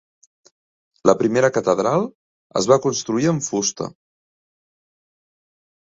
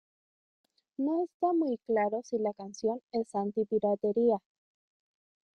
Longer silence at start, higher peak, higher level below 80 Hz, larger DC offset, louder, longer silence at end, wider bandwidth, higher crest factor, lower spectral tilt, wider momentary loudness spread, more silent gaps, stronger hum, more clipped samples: about the same, 1.05 s vs 1 s; first, -2 dBFS vs -16 dBFS; first, -60 dBFS vs -76 dBFS; neither; first, -19 LUFS vs -31 LUFS; first, 2.05 s vs 1.2 s; second, 7.8 kHz vs 9.4 kHz; first, 22 dB vs 16 dB; second, -4.5 dB/octave vs -7 dB/octave; first, 10 LU vs 7 LU; first, 2.15-2.50 s vs 1.34-1.40 s, 3.03-3.08 s; neither; neither